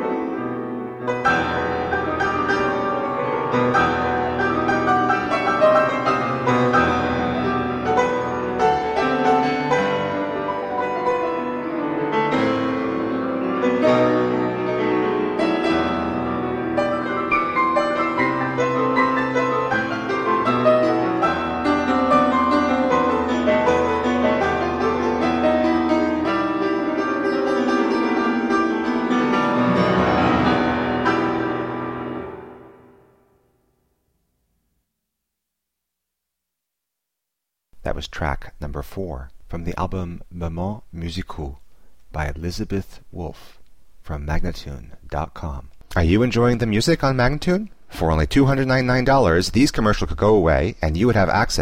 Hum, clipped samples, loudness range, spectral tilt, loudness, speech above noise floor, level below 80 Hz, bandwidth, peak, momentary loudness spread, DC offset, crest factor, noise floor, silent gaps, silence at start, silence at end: none; under 0.1%; 12 LU; -6 dB/octave; -20 LUFS; 62 dB; -36 dBFS; 15.5 kHz; -4 dBFS; 13 LU; under 0.1%; 18 dB; -82 dBFS; none; 0 s; 0 s